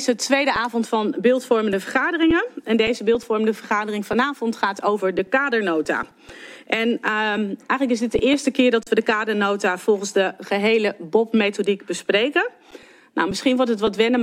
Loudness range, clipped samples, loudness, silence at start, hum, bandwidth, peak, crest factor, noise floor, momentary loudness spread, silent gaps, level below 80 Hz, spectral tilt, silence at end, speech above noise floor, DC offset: 2 LU; under 0.1%; -21 LUFS; 0 s; none; 15.5 kHz; -4 dBFS; 16 dB; -46 dBFS; 5 LU; none; -52 dBFS; -4 dB/octave; 0 s; 25 dB; under 0.1%